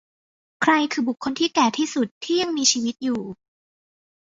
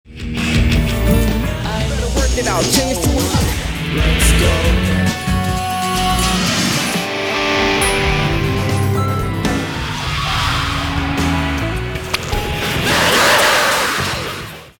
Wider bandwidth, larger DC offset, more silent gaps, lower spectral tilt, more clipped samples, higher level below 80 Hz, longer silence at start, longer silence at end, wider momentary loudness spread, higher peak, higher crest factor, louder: second, 7.8 kHz vs 17.5 kHz; neither; first, 2.11-2.21 s vs none; second, -2 dB/octave vs -4 dB/octave; neither; second, -66 dBFS vs -24 dBFS; first, 0.6 s vs 0.05 s; first, 0.9 s vs 0.1 s; about the same, 8 LU vs 8 LU; about the same, -4 dBFS vs -2 dBFS; first, 20 dB vs 14 dB; second, -22 LUFS vs -16 LUFS